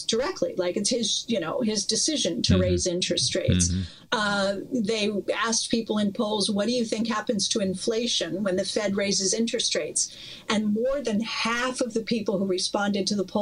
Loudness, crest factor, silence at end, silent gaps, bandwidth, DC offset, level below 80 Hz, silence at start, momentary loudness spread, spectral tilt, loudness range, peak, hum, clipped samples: -25 LUFS; 18 dB; 0 s; none; 11.5 kHz; under 0.1%; -50 dBFS; 0 s; 4 LU; -3.5 dB/octave; 2 LU; -8 dBFS; none; under 0.1%